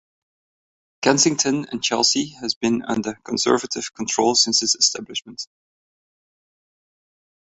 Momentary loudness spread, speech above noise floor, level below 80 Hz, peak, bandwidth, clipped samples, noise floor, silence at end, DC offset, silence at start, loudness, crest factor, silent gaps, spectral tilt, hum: 13 LU; over 69 dB; -62 dBFS; -2 dBFS; 8.4 kHz; under 0.1%; under -90 dBFS; 1.95 s; under 0.1%; 1 s; -19 LUFS; 22 dB; 2.56-2.61 s; -2 dB/octave; none